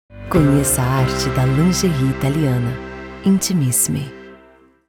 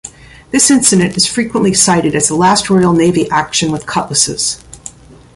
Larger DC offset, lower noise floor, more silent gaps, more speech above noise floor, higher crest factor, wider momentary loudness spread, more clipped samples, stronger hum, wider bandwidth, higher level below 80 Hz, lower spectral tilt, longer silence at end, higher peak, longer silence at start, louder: neither; first, -49 dBFS vs -34 dBFS; neither; first, 33 dB vs 23 dB; about the same, 16 dB vs 12 dB; about the same, 10 LU vs 11 LU; neither; neither; first, 19 kHz vs 13.5 kHz; first, -34 dBFS vs -42 dBFS; first, -5 dB/octave vs -3.5 dB/octave; about the same, 0.5 s vs 0.45 s; about the same, -2 dBFS vs 0 dBFS; about the same, 0.1 s vs 0.05 s; second, -17 LUFS vs -11 LUFS